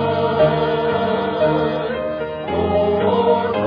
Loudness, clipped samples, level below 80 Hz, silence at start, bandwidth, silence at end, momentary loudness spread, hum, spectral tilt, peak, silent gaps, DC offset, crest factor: -18 LUFS; under 0.1%; -44 dBFS; 0 s; 5.2 kHz; 0 s; 7 LU; none; -9 dB/octave; -4 dBFS; none; under 0.1%; 14 dB